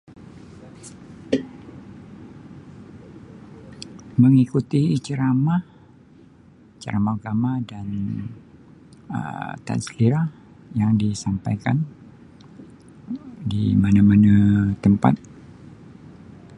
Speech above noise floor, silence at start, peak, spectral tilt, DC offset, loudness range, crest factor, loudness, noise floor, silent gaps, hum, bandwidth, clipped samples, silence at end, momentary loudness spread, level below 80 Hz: 31 dB; 0.2 s; -2 dBFS; -8 dB/octave; under 0.1%; 9 LU; 22 dB; -21 LUFS; -50 dBFS; none; none; 11 kHz; under 0.1%; 0 s; 27 LU; -46 dBFS